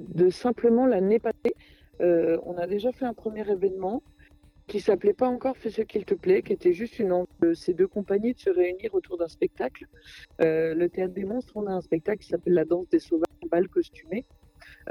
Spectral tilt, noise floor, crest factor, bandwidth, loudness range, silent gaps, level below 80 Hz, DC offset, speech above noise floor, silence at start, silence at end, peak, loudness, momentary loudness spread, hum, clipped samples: -8 dB/octave; -55 dBFS; 16 dB; 10.5 kHz; 3 LU; none; -58 dBFS; under 0.1%; 30 dB; 0 s; 0 s; -10 dBFS; -26 LUFS; 9 LU; none; under 0.1%